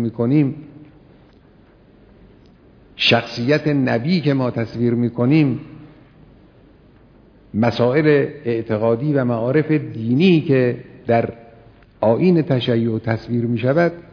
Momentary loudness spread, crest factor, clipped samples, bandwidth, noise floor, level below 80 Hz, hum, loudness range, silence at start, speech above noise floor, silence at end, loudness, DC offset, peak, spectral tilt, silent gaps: 7 LU; 18 dB; under 0.1%; 5.4 kHz; -49 dBFS; -54 dBFS; none; 4 LU; 0 s; 32 dB; 0.1 s; -18 LUFS; under 0.1%; -2 dBFS; -8 dB/octave; none